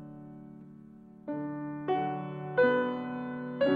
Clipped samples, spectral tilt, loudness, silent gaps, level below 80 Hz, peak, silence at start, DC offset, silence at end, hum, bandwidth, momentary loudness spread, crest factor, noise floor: under 0.1%; -9 dB/octave; -32 LUFS; none; -72 dBFS; -14 dBFS; 0 s; under 0.1%; 0 s; none; 4.9 kHz; 24 LU; 18 dB; -52 dBFS